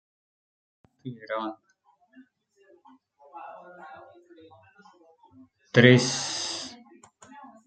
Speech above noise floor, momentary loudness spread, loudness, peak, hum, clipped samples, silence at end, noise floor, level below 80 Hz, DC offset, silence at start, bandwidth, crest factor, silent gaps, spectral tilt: 44 dB; 29 LU; -23 LUFS; -2 dBFS; none; under 0.1%; 0.2 s; -66 dBFS; -70 dBFS; under 0.1%; 1.05 s; 9.2 kHz; 28 dB; none; -4.5 dB/octave